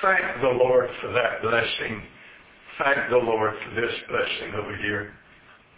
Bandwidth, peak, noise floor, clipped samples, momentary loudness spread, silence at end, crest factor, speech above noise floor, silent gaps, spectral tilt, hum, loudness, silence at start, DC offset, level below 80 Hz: 4 kHz; -8 dBFS; -53 dBFS; under 0.1%; 11 LU; 0.6 s; 18 dB; 29 dB; none; -8.5 dB/octave; none; -24 LUFS; 0 s; under 0.1%; -56 dBFS